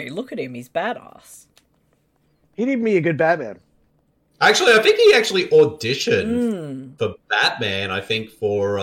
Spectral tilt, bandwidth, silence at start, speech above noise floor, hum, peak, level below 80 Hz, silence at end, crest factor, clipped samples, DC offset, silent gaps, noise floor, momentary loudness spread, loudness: -4 dB/octave; 16 kHz; 0 s; 44 dB; none; -4 dBFS; -60 dBFS; 0 s; 16 dB; under 0.1%; under 0.1%; none; -63 dBFS; 16 LU; -18 LUFS